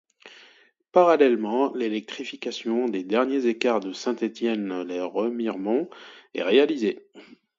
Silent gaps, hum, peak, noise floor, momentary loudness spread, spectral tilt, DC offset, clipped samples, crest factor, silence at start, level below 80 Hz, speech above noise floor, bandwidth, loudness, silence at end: none; none; -4 dBFS; -58 dBFS; 12 LU; -5 dB/octave; under 0.1%; under 0.1%; 20 dB; 0.25 s; -76 dBFS; 34 dB; 7.6 kHz; -24 LUFS; 0.25 s